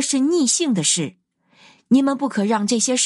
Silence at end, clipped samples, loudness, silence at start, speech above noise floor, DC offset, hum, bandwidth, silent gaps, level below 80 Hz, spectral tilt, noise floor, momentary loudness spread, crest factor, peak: 0 s; under 0.1%; -18 LUFS; 0 s; 35 dB; under 0.1%; none; 11.5 kHz; none; -74 dBFS; -3 dB/octave; -54 dBFS; 4 LU; 14 dB; -6 dBFS